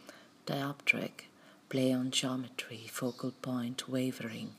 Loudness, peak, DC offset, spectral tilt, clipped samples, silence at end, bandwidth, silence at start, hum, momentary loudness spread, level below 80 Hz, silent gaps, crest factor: -35 LUFS; -14 dBFS; under 0.1%; -4 dB/octave; under 0.1%; 0 s; 15.5 kHz; 0 s; none; 12 LU; -86 dBFS; none; 24 dB